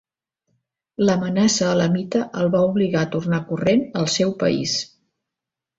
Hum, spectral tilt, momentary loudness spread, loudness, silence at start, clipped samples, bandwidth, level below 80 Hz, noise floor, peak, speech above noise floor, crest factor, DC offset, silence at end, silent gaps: none; -5 dB/octave; 5 LU; -20 LUFS; 1 s; under 0.1%; 8 kHz; -56 dBFS; -86 dBFS; -6 dBFS; 66 dB; 16 dB; under 0.1%; 0.95 s; none